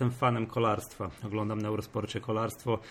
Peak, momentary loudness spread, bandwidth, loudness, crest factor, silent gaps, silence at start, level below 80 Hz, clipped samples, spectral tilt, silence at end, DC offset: -14 dBFS; 7 LU; 16.5 kHz; -32 LUFS; 18 dB; none; 0 s; -60 dBFS; under 0.1%; -6.5 dB/octave; 0 s; under 0.1%